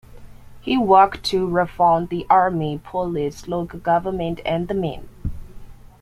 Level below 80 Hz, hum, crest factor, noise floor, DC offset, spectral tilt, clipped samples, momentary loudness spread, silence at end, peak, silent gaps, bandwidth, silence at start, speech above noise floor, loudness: -42 dBFS; none; 18 dB; -40 dBFS; under 0.1%; -6.5 dB/octave; under 0.1%; 14 LU; 0.3 s; -2 dBFS; none; 15 kHz; 0.1 s; 20 dB; -20 LUFS